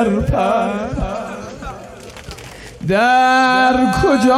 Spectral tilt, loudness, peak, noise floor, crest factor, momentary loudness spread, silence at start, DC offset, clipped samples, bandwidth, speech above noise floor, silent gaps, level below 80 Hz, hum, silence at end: -5.5 dB/octave; -15 LUFS; -4 dBFS; -35 dBFS; 12 dB; 21 LU; 0 s; under 0.1%; under 0.1%; 15 kHz; 21 dB; none; -32 dBFS; none; 0 s